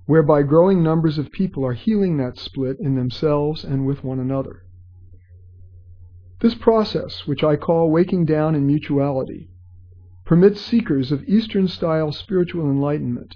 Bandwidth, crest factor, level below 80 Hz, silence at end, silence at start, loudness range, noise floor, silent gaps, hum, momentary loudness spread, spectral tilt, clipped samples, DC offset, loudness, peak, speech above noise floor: 5.4 kHz; 20 dB; -46 dBFS; 0 s; 0.1 s; 5 LU; -44 dBFS; none; none; 9 LU; -9.5 dB/octave; under 0.1%; under 0.1%; -19 LUFS; 0 dBFS; 26 dB